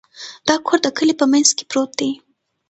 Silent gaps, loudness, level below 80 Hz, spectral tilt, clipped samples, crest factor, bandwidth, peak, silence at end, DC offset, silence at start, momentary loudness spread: none; -17 LUFS; -62 dBFS; -1.5 dB/octave; under 0.1%; 18 dB; 9 kHz; 0 dBFS; 0.55 s; under 0.1%; 0.2 s; 11 LU